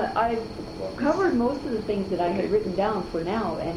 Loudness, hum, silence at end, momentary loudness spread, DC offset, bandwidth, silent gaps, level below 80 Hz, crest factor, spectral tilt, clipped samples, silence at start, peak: -26 LUFS; none; 0 s; 8 LU; under 0.1%; 12 kHz; none; -46 dBFS; 16 dB; -7 dB/octave; under 0.1%; 0 s; -10 dBFS